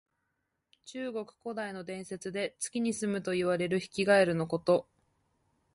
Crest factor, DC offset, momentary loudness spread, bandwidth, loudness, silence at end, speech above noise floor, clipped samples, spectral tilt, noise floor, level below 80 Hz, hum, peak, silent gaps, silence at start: 20 dB; under 0.1%; 15 LU; 11.5 kHz; -31 LUFS; 0.9 s; 51 dB; under 0.1%; -5 dB/octave; -82 dBFS; -70 dBFS; none; -14 dBFS; none; 0.85 s